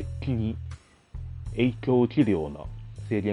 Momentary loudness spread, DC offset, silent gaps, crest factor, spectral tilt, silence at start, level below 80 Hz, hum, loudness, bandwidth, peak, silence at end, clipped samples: 19 LU; under 0.1%; none; 18 dB; -8.5 dB/octave; 0 s; -42 dBFS; none; -27 LUFS; 11 kHz; -10 dBFS; 0 s; under 0.1%